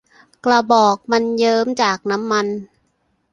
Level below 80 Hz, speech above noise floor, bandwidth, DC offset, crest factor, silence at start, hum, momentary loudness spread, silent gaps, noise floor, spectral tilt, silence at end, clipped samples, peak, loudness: -62 dBFS; 49 dB; 10.5 kHz; under 0.1%; 16 dB; 0.45 s; none; 9 LU; none; -65 dBFS; -4 dB/octave; 0.7 s; under 0.1%; -2 dBFS; -17 LUFS